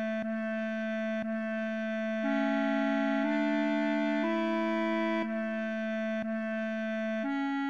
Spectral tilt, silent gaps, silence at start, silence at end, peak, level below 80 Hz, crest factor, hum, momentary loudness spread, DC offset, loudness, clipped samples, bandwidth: -6.5 dB/octave; none; 0 s; 0 s; -20 dBFS; -76 dBFS; 12 dB; none; 4 LU; 0.1%; -31 LUFS; under 0.1%; 7.4 kHz